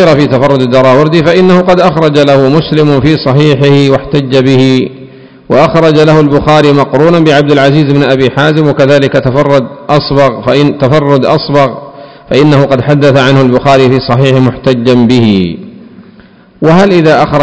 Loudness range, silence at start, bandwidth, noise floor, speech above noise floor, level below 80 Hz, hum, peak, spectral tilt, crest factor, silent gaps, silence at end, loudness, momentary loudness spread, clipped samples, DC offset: 2 LU; 0 s; 8 kHz; -37 dBFS; 31 dB; -36 dBFS; none; 0 dBFS; -7 dB/octave; 6 dB; none; 0 s; -6 LUFS; 4 LU; 10%; under 0.1%